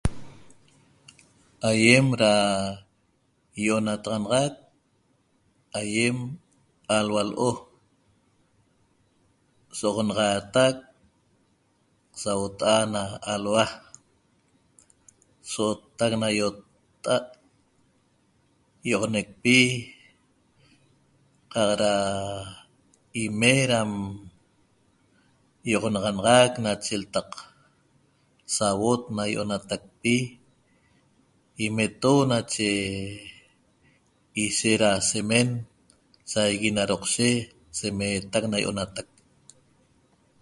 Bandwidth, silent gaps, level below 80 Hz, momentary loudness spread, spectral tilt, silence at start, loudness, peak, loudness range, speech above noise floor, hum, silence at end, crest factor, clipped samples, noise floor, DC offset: 11.5 kHz; none; -52 dBFS; 17 LU; -4 dB/octave; 0.05 s; -24 LUFS; -2 dBFS; 6 LU; 44 dB; none; 1.4 s; 26 dB; under 0.1%; -68 dBFS; under 0.1%